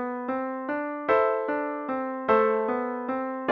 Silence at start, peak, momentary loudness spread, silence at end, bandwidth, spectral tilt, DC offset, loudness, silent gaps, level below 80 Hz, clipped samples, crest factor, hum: 0 s; -8 dBFS; 8 LU; 0 s; 5.6 kHz; -7.5 dB/octave; under 0.1%; -27 LUFS; none; -66 dBFS; under 0.1%; 18 dB; none